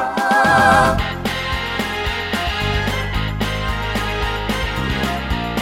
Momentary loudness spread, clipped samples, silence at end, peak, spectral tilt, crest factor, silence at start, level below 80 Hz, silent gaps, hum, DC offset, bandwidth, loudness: 9 LU; under 0.1%; 0 s; 0 dBFS; -4.5 dB/octave; 18 dB; 0 s; -28 dBFS; none; none; under 0.1%; 17 kHz; -18 LUFS